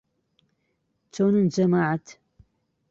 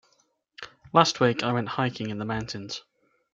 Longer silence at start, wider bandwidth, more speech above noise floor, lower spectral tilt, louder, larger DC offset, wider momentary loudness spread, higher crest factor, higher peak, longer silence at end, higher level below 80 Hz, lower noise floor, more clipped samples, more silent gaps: first, 1.15 s vs 0.6 s; second, 7.6 kHz vs 9 kHz; first, 52 dB vs 43 dB; first, -7.5 dB/octave vs -5 dB/octave; first, -23 LUFS vs -26 LUFS; neither; second, 10 LU vs 20 LU; second, 16 dB vs 26 dB; second, -10 dBFS vs -2 dBFS; first, 0.8 s vs 0.55 s; second, -66 dBFS vs -60 dBFS; first, -74 dBFS vs -69 dBFS; neither; neither